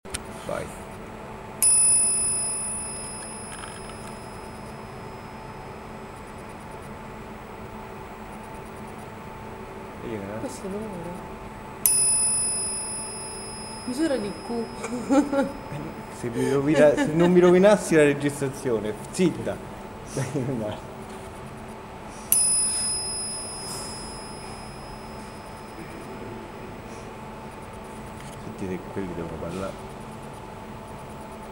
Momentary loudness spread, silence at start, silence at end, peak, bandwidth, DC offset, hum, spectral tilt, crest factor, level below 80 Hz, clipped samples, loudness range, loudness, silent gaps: 21 LU; 0.05 s; 0 s; 0 dBFS; 16 kHz; under 0.1%; none; -3.5 dB/octave; 28 dB; -50 dBFS; under 0.1%; 18 LU; -23 LUFS; none